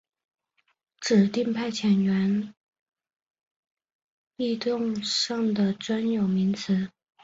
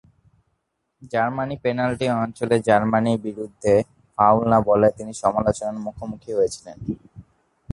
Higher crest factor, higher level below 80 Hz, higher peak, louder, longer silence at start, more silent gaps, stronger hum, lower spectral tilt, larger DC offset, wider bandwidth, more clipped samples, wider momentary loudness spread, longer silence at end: about the same, 18 dB vs 20 dB; second, -68 dBFS vs -50 dBFS; second, -10 dBFS vs -2 dBFS; second, -26 LUFS vs -21 LUFS; about the same, 1 s vs 1 s; first, 2.57-2.72 s, 2.81-2.86 s, 3.16-3.34 s, 3.51-3.63 s, 3.95-4.25 s vs none; neither; about the same, -5.5 dB/octave vs -6.5 dB/octave; neither; second, 8 kHz vs 11.5 kHz; neither; second, 8 LU vs 14 LU; second, 0.35 s vs 0.5 s